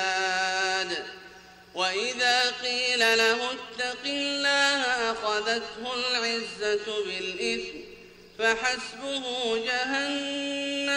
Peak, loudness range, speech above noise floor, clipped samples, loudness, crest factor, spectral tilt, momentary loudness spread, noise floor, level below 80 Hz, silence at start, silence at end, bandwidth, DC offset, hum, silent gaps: -10 dBFS; 5 LU; 21 dB; under 0.1%; -26 LUFS; 18 dB; -1 dB/octave; 10 LU; -49 dBFS; -64 dBFS; 0 s; 0 s; 15 kHz; under 0.1%; 60 Hz at -60 dBFS; none